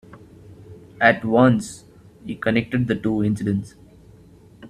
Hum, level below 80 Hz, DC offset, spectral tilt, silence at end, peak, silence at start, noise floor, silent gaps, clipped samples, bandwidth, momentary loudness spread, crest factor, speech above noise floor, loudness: none; -52 dBFS; under 0.1%; -6.5 dB/octave; 0 s; 0 dBFS; 0.1 s; -48 dBFS; none; under 0.1%; 13 kHz; 20 LU; 22 dB; 28 dB; -20 LUFS